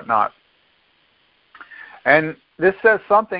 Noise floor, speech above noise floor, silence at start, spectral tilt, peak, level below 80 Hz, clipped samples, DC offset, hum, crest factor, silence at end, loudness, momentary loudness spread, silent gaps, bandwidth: -60 dBFS; 43 dB; 0 s; -9.5 dB/octave; 0 dBFS; -60 dBFS; under 0.1%; under 0.1%; none; 20 dB; 0 s; -18 LUFS; 17 LU; none; 5.2 kHz